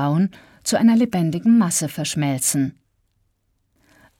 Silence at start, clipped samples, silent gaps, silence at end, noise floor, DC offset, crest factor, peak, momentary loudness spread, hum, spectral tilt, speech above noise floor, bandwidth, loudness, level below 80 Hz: 0 s; under 0.1%; none; 1.5 s; -68 dBFS; under 0.1%; 14 dB; -6 dBFS; 8 LU; none; -5 dB/octave; 49 dB; 16.5 kHz; -19 LUFS; -60 dBFS